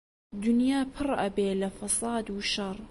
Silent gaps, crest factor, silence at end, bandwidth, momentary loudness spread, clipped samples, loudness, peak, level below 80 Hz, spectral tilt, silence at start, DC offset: none; 14 dB; 0 s; 12 kHz; 6 LU; under 0.1%; -29 LUFS; -16 dBFS; -54 dBFS; -4 dB/octave; 0.3 s; under 0.1%